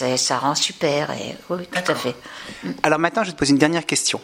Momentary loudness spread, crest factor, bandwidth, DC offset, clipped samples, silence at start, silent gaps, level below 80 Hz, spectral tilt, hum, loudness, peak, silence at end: 13 LU; 20 dB; 16 kHz; under 0.1%; under 0.1%; 0 s; none; -56 dBFS; -3 dB/octave; none; -20 LUFS; 0 dBFS; 0 s